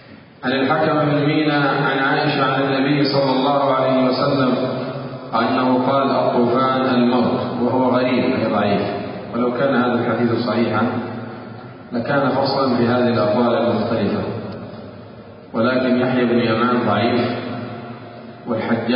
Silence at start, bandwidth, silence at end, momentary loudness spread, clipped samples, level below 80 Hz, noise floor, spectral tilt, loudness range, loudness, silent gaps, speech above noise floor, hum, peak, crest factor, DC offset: 0.1 s; 5.4 kHz; 0 s; 13 LU; under 0.1%; -54 dBFS; -38 dBFS; -11.5 dB/octave; 3 LU; -18 LUFS; none; 21 dB; none; -4 dBFS; 14 dB; under 0.1%